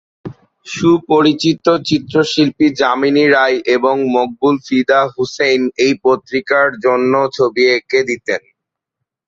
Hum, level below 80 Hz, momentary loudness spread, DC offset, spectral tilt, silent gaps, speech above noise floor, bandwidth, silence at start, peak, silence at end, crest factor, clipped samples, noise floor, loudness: none; -56 dBFS; 6 LU; under 0.1%; -5 dB/octave; none; 65 dB; 7.8 kHz; 0.25 s; 0 dBFS; 0.9 s; 14 dB; under 0.1%; -78 dBFS; -14 LUFS